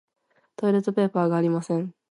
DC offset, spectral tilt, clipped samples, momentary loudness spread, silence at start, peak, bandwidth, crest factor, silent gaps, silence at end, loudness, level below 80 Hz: under 0.1%; -8 dB/octave; under 0.1%; 6 LU; 0.6 s; -10 dBFS; 11 kHz; 16 dB; none; 0.2 s; -24 LUFS; -76 dBFS